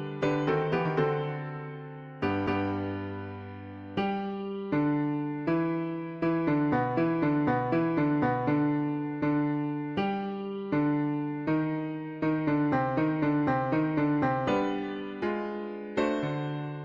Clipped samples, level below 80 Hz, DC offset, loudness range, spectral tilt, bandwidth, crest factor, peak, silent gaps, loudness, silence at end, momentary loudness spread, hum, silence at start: under 0.1%; -60 dBFS; under 0.1%; 4 LU; -8.5 dB/octave; 7.4 kHz; 14 dB; -14 dBFS; none; -29 LUFS; 0 s; 9 LU; none; 0 s